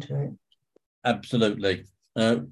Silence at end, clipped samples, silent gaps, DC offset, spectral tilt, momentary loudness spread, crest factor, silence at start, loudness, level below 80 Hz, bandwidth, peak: 0 s; under 0.1%; 0.86-1.02 s; under 0.1%; -6 dB/octave; 10 LU; 18 dB; 0 s; -27 LUFS; -58 dBFS; 11.5 kHz; -8 dBFS